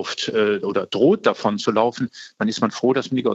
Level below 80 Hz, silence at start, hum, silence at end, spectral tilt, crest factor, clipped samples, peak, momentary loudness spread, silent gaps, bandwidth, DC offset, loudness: -70 dBFS; 0 s; none; 0 s; -5 dB/octave; 18 dB; under 0.1%; -2 dBFS; 7 LU; none; 8 kHz; under 0.1%; -21 LUFS